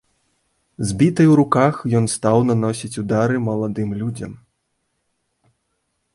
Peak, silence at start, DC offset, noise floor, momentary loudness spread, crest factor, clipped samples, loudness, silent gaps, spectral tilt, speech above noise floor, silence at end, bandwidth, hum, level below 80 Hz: -2 dBFS; 0.8 s; under 0.1%; -72 dBFS; 13 LU; 18 dB; under 0.1%; -18 LUFS; none; -6.5 dB/octave; 54 dB; 1.8 s; 11.5 kHz; none; -50 dBFS